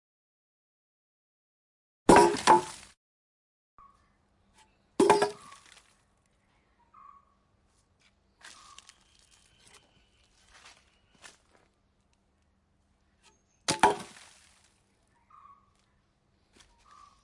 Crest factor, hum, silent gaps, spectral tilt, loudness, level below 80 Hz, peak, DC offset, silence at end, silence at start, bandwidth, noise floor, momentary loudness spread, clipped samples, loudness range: 28 dB; none; 2.97-3.78 s; -4 dB/octave; -24 LUFS; -60 dBFS; -6 dBFS; under 0.1%; 3.2 s; 2.1 s; 11.5 kHz; -71 dBFS; 30 LU; under 0.1%; 7 LU